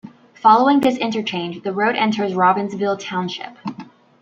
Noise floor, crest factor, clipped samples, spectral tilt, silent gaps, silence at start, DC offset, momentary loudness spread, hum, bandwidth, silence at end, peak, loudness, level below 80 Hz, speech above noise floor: -39 dBFS; 18 dB; under 0.1%; -5.5 dB/octave; none; 0.05 s; under 0.1%; 16 LU; none; 8.6 kHz; 0.35 s; -2 dBFS; -18 LUFS; -64 dBFS; 21 dB